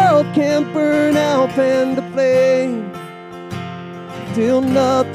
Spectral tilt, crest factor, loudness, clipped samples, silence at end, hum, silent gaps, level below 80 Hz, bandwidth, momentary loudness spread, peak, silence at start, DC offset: -6 dB/octave; 14 dB; -16 LUFS; under 0.1%; 0 s; none; none; -60 dBFS; 15 kHz; 16 LU; -2 dBFS; 0 s; under 0.1%